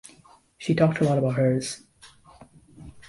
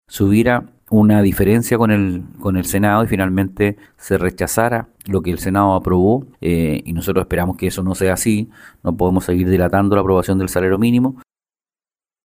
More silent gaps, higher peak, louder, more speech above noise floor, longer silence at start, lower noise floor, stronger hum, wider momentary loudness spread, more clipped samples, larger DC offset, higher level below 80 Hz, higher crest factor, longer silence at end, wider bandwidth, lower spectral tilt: neither; second, -8 dBFS vs 0 dBFS; second, -24 LUFS vs -17 LUFS; second, 33 dB vs over 74 dB; first, 0.6 s vs 0.1 s; second, -55 dBFS vs under -90 dBFS; neither; first, 13 LU vs 7 LU; neither; neither; second, -58 dBFS vs -38 dBFS; about the same, 20 dB vs 16 dB; second, 0.1 s vs 1.05 s; second, 11.5 kHz vs 16 kHz; about the same, -6.5 dB/octave vs -6.5 dB/octave